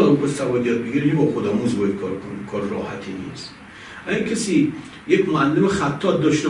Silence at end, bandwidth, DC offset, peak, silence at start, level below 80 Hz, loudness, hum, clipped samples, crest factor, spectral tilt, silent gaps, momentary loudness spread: 0 s; 11 kHz; under 0.1%; -4 dBFS; 0 s; -54 dBFS; -21 LUFS; none; under 0.1%; 18 dB; -6 dB/octave; none; 15 LU